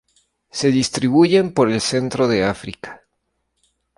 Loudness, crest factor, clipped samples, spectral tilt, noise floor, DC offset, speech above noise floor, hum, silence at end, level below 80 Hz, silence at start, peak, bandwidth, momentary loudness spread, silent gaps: -17 LUFS; 16 dB; under 0.1%; -5 dB/octave; -72 dBFS; under 0.1%; 55 dB; none; 1 s; -52 dBFS; 0.55 s; -2 dBFS; 11.5 kHz; 17 LU; none